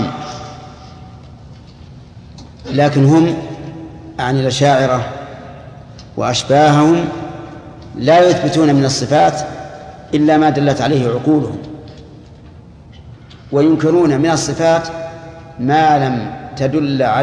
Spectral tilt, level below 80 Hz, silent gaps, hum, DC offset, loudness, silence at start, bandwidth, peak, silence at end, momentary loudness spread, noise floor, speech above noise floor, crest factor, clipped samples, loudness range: -6 dB/octave; -44 dBFS; none; none; under 0.1%; -14 LUFS; 0 s; 10.5 kHz; 0 dBFS; 0 s; 23 LU; -38 dBFS; 25 dB; 16 dB; under 0.1%; 5 LU